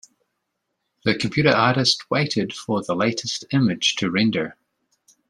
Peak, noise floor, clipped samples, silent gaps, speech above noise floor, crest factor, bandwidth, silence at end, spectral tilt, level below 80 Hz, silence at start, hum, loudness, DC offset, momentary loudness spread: -2 dBFS; -77 dBFS; under 0.1%; none; 56 dB; 20 dB; 12 kHz; 0.75 s; -4.5 dB/octave; -60 dBFS; 1.05 s; none; -21 LUFS; under 0.1%; 9 LU